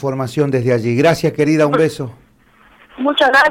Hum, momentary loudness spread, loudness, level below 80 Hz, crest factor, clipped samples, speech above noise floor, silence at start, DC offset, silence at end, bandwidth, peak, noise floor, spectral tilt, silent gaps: none; 9 LU; -15 LUFS; -52 dBFS; 14 dB; under 0.1%; 36 dB; 0 s; under 0.1%; 0 s; 16 kHz; -2 dBFS; -50 dBFS; -6 dB/octave; none